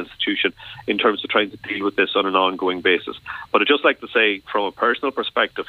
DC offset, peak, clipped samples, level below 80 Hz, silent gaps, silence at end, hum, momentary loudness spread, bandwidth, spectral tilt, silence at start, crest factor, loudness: under 0.1%; 0 dBFS; under 0.1%; -60 dBFS; none; 0.05 s; none; 7 LU; 4.9 kHz; -5.5 dB/octave; 0 s; 20 dB; -20 LUFS